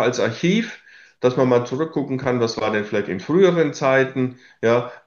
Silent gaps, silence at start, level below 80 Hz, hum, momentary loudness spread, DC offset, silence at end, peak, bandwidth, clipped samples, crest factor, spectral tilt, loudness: none; 0 s; -62 dBFS; none; 7 LU; under 0.1%; 0.1 s; -4 dBFS; 7.4 kHz; under 0.1%; 16 dB; -6 dB/octave; -20 LUFS